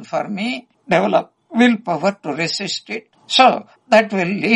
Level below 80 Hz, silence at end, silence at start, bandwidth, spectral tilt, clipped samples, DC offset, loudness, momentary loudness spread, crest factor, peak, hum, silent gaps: -66 dBFS; 0 s; 0 s; 10.5 kHz; -4.5 dB/octave; under 0.1%; under 0.1%; -17 LUFS; 12 LU; 18 dB; 0 dBFS; none; none